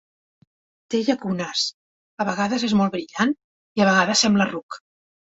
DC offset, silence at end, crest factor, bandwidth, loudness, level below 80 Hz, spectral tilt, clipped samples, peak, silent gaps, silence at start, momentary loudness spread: under 0.1%; 0.55 s; 18 dB; 8 kHz; -21 LUFS; -62 dBFS; -4 dB/octave; under 0.1%; -4 dBFS; 1.74-2.17 s, 3.44-3.75 s, 4.63-4.69 s; 0.9 s; 14 LU